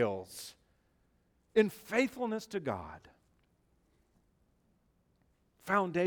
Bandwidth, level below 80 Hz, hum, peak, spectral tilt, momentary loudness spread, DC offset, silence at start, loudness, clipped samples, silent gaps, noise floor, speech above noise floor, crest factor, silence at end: over 20 kHz; -72 dBFS; none; -14 dBFS; -5.5 dB/octave; 19 LU; under 0.1%; 0 s; -34 LUFS; under 0.1%; none; -73 dBFS; 40 dB; 22 dB; 0 s